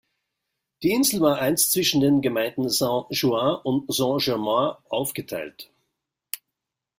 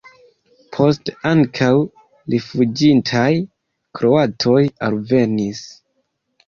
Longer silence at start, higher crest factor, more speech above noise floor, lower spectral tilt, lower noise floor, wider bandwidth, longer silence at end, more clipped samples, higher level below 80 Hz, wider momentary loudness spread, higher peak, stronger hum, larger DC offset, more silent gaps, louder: about the same, 0.8 s vs 0.7 s; about the same, 18 dB vs 16 dB; first, 61 dB vs 53 dB; second, -4 dB/octave vs -6.5 dB/octave; first, -84 dBFS vs -69 dBFS; first, 16.5 kHz vs 7.2 kHz; second, 0.6 s vs 0.75 s; neither; second, -62 dBFS vs -54 dBFS; about the same, 14 LU vs 15 LU; second, -6 dBFS vs -2 dBFS; neither; neither; neither; second, -22 LUFS vs -17 LUFS